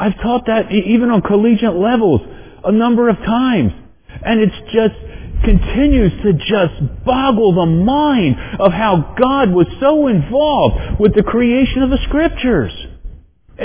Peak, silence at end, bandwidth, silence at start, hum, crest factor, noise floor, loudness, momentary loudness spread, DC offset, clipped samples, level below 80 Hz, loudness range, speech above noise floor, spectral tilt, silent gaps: 0 dBFS; 0 s; 4 kHz; 0 s; none; 14 dB; -39 dBFS; -14 LUFS; 5 LU; under 0.1%; under 0.1%; -26 dBFS; 2 LU; 26 dB; -11.5 dB/octave; none